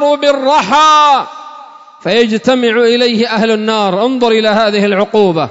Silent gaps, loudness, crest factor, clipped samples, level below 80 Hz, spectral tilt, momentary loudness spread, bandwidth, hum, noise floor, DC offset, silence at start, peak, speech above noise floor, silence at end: none; -10 LUFS; 10 dB; under 0.1%; -56 dBFS; -4.5 dB/octave; 6 LU; 8 kHz; none; -34 dBFS; under 0.1%; 0 s; 0 dBFS; 24 dB; 0 s